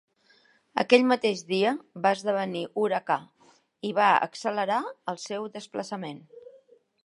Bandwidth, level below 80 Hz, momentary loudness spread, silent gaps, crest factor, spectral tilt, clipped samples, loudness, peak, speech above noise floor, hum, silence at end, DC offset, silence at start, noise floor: 11.5 kHz; -82 dBFS; 14 LU; none; 26 dB; -4.5 dB/octave; under 0.1%; -27 LUFS; -2 dBFS; 37 dB; none; 0.6 s; under 0.1%; 0.75 s; -63 dBFS